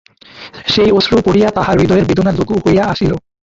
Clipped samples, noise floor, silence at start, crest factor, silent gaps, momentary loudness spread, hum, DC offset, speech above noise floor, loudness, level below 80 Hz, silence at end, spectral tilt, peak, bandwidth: under 0.1%; -36 dBFS; 0.35 s; 12 dB; none; 8 LU; none; under 0.1%; 24 dB; -12 LUFS; -34 dBFS; 0.3 s; -6.5 dB/octave; 0 dBFS; 7.8 kHz